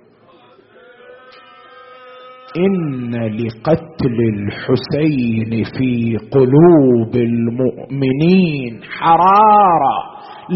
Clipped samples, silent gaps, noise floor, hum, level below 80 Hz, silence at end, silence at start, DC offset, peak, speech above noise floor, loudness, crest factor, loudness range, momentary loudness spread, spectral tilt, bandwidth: under 0.1%; none; -47 dBFS; none; -48 dBFS; 0 s; 1.1 s; under 0.1%; 0 dBFS; 34 dB; -14 LUFS; 14 dB; 9 LU; 12 LU; -7 dB/octave; 5.8 kHz